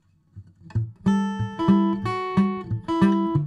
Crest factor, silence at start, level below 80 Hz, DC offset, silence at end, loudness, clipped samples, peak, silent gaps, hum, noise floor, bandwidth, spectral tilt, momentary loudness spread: 16 dB; 0.35 s; -50 dBFS; under 0.1%; 0 s; -23 LUFS; under 0.1%; -6 dBFS; none; none; -47 dBFS; 8.4 kHz; -8.5 dB/octave; 10 LU